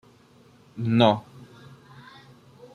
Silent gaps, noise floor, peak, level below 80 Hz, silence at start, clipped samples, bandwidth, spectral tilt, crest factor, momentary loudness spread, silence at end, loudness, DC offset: none; -55 dBFS; -4 dBFS; -66 dBFS; 0.75 s; under 0.1%; 9.6 kHz; -7.5 dB/octave; 24 dB; 27 LU; 1.3 s; -22 LUFS; under 0.1%